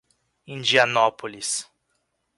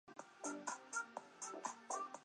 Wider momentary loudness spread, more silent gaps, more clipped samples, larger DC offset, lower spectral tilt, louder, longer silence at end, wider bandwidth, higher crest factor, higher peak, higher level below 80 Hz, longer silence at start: first, 12 LU vs 5 LU; neither; neither; neither; about the same, -1.5 dB/octave vs -1.5 dB/octave; first, -22 LUFS vs -48 LUFS; first, 0.75 s vs 0 s; about the same, 11.5 kHz vs 11 kHz; about the same, 22 dB vs 20 dB; first, -4 dBFS vs -30 dBFS; first, -70 dBFS vs under -90 dBFS; first, 0.5 s vs 0.05 s